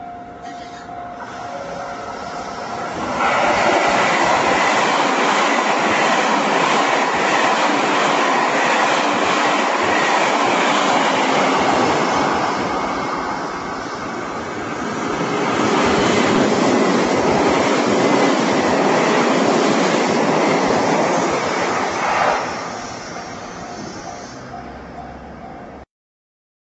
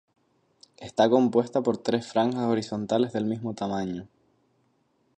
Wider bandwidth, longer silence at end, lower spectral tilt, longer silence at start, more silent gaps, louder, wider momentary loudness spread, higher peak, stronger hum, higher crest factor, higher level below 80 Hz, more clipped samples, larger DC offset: second, 8.2 kHz vs 9.2 kHz; second, 0.85 s vs 1.1 s; second, -3.5 dB/octave vs -6.5 dB/octave; second, 0 s vs 0.8 s; neither; first, -17 LUFS vs -26 LUFS; first, 16 LU vs 11 LU; first, -2 dBFS vs -6 dBFS; neither; about the same, 16 dB vs 20 dB; first, -50 dBFS vs -66 dBFS; neither; neither